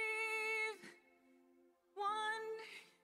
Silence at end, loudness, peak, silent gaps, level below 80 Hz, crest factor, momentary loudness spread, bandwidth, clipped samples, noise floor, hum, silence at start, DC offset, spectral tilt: 0.2 s; -41 LUFS; -30 dBFS; none; under -90 dBFS; 14 dB; 17 LU; 15.5 kHz; under 0.1%; -72 dBFS; none; 0 s; under 0.1%; -0.5 dB/octave